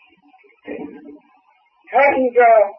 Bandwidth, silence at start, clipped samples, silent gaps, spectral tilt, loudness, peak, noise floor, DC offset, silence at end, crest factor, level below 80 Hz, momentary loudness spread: 5.6 kHz; 0.7 s; under 0.1%; none; -7 dB/octave; -14 LUFS; -2 dBFS; -57 dBFS; under 0.1%; 0.05 s; 16 dB; -62 dBFS; 22 LU